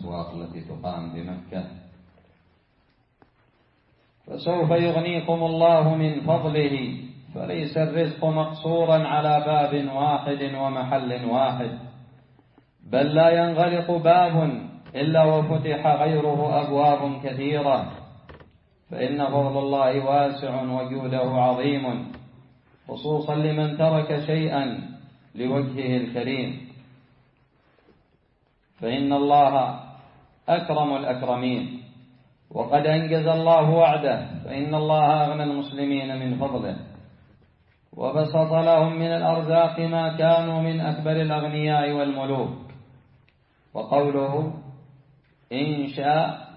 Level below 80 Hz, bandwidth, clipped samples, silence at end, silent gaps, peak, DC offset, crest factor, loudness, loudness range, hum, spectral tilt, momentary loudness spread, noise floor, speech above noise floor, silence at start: -62 dBFS; 5.4 kHz; under 0.1%; 0 s; none; -6 dBFS; under 0.1%; 18 dB; -23 LUFS; 8 LU; none; -11.5 dB/octave; 15 LU; -65 dBFS; 43 dB; 0 s